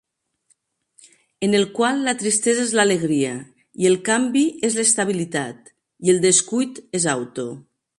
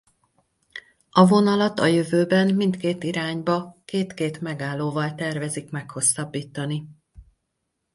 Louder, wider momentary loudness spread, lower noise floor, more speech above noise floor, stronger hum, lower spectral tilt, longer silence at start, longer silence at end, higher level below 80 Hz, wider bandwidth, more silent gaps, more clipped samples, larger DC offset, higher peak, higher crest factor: first, -19 LUFS vs -23 LUFS; about the same, 12 LU vs 13 LU; second, -65 dBFS vs -78 dBFS; second, 46 dB vs 55 dB; neither; second, -3.5 dB/octave vs -5 dB/octave; first, 1.4 s vs 0.75 s; second, 0.4 s vs 0.7 s; about the same, -66 dBFS vs -62 dBFS; about the same, 11.5 kHz vs 11.5 kHz; neither; neither; neither; about the same, -4 dBFS vs -4 dBFS; about the same, 18 dB vs 20 dB